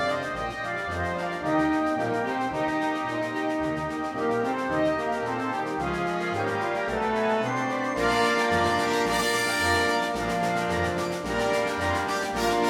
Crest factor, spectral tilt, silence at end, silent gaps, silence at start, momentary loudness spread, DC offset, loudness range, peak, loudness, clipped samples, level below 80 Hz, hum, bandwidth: 16 dB; -4.5 dB/octave; 0 s; none; 0 s; 6 LU; under 0.1%; 3 LU; -10 dBFS; -26 LUFS; under 0.1%; -50 dBFS; none; 18 kHz